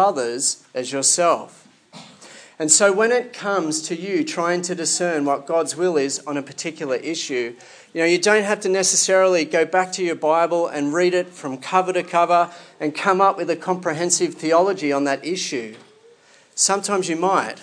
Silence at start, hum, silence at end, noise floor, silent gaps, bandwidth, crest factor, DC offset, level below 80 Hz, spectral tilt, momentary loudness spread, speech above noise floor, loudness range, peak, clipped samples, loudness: 0 s; none; 0 s; -52 dBFS; none; 10.5 kHz; 20 dB; under 0.1%; -84 dBFS; -2.5 dB/octave; 11 LU; 32 dB; 4 LU; 0 dBFS; under 0.1%; -20 LUFS